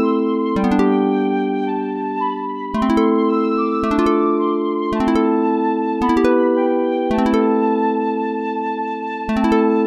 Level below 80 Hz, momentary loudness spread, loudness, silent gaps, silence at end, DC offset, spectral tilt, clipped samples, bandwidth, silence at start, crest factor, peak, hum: -44 dBFS; 7 LU; -18 LUFS; none; 0 s; under 0.1%; -7.5 dB/octave; under 0.1%; 9.8 kHz; 0 s; 14 dB; -4 dBFS; none